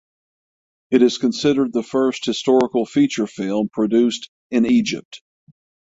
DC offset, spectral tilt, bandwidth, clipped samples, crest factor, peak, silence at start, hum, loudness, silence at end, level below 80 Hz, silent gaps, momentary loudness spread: under 0.1%; -5 dB/octave; 8 kHz; under 0.1%; 16 dB; -2 dBFS; 0.9 s; none; -19 LUFS; 0.7 s; -60 dBFS; 4.28-4.50 s, 5.05-5.11 s; 7 LU